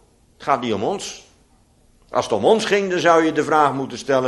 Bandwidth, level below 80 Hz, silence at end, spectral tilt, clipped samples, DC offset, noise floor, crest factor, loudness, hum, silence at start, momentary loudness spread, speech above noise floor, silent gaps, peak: 11.5 kHz; -58 dBFS; 0 s; -4.5 dB/octave; under 0.1%; under 0.1%; -56 dBFS; 18 dB; -19 LUFS; none; 0.4 s; 12 LU; 37 dB; none; -2 dBFS